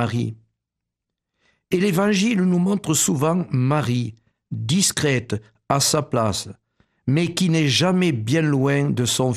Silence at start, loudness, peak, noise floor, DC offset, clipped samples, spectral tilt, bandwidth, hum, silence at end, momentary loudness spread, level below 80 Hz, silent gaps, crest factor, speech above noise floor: 0 s; -20 LUFS; -4 dBFS; -83 dBFS; under 0.1%; under 0.1%; -4.5 dB/octave; 14 kHz; none; 0 s; 11 LU; -56 dBFS; none; 18 dB; 63 dB